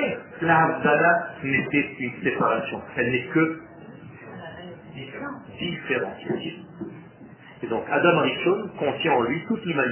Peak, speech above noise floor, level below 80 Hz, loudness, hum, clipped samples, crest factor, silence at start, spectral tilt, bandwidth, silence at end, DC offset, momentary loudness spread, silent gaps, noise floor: -6 dBFS; 22 dB; -60 dBFS; -23 LUFS; none; under 0.1%; 20 dB; 0 s; -9.5 dB/octave; 3.2 kHz; 0 s; under 0.1%; 20 LU; none; -46 dBFS